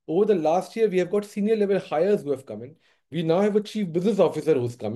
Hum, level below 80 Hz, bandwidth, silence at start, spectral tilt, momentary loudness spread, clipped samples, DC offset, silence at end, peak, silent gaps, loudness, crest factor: none; -70 dBFS; 12.5 kHz; 0.1 s; -7 dB/octave; 9 LU; under 0.1%; under 0.1%; 0 s; -6 dBFS; none; -23 LUFS; 16 dB